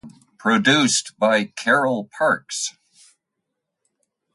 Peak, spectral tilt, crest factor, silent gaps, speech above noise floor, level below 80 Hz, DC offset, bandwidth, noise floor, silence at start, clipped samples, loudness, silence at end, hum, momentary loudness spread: -4 dBFS; -3 dB/octave; 18 dB; none; 60 dB; -68 dBFS; under 0.1%; 11.5 kHz; -80 dBFS; 0.05 s; under 0.1%; -19 LUFS; 1.65 s; none; 11 LU